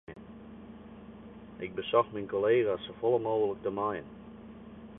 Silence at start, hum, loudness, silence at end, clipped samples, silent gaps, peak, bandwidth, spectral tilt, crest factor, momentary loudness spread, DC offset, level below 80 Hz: 0.1 s; none; -31 LUFS; 0 s; under 0.1%; none; -12 dBFS; 3.9 kHz; -9.5 dB/octave; 20 dB; 21 LU; under 0.1%; -62 dBFS